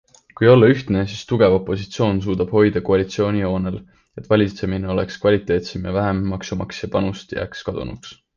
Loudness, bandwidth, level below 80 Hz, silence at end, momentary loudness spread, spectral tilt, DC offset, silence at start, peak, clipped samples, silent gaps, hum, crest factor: -19 LUFS; 7.4 kHz; -40 dBFS; 0.2 s; 12 LU; -7 dB/octave; under 0.1%; 0.4 s; -2 dBFS; under 0.1%; none; none; 18 dB